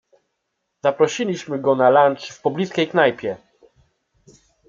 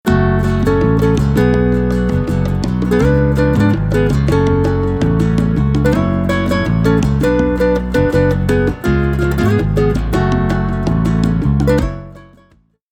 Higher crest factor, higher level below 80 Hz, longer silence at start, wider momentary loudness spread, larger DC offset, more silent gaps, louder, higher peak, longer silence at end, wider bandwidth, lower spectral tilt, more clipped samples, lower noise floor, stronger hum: first, 18 dB vs 12 dB; second, -68 dBFS vs -24 dBFS; first, 0.85 s vs 0.05 s; first, 11 LU vs 3 LU; neither; neither; second, -19 LUFS vs -14 LUFS; about the same, -2 dBFS vs 0 dBFS; first, 1.3 s vs 0.75 s; second, 7.6 kHz vs 16 kHz; second, -5 dB/octave vs -8 dB/octave; neither; first, -76 dBFS vs -52 dBFS; neither